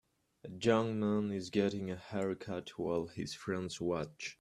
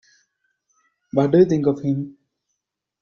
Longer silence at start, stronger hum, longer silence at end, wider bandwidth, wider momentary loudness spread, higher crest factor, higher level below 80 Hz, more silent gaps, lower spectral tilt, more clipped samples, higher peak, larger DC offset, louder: second, 0.45 s vs 1.15 s; neither; second, 0.1 s vs 0.9 s; first, 12 kHz vs 7 kHz; about the same, 10 LU vs 11 LU; about the same, 20 dB vs 20 dB; second, -68 dBFS vs -58 dBFS; neither; second, -6 dB/octave vs -9 dB/octave; neither; second, -16 dBFS vs -4 dBFS; neither; second, -36 LUFS vs -19 LUFS